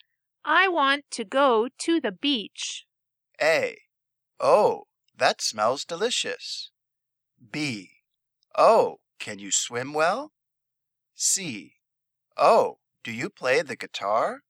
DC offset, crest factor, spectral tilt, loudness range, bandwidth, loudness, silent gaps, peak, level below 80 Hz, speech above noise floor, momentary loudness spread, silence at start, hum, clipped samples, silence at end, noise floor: under 0.1%; 22 dB; -2 dB/octave; 4 LU; 16.5 kHz; -24 LUFS; none; -4 dBFS; -82 dBFS; 60 dB; 16 LU; 0.45 s; none; under 0.1%; 0.1 s; -84 dBFS